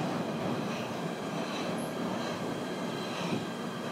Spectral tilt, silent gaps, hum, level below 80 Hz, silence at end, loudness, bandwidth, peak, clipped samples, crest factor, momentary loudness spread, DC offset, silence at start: -5 dB/octave; none; none; -72 dBFS; 0 s; -35 LUFS; 16 kHz; -20 dBFS; under 0.1%; 14 dB; 2 LU; under 0.1%; 0 s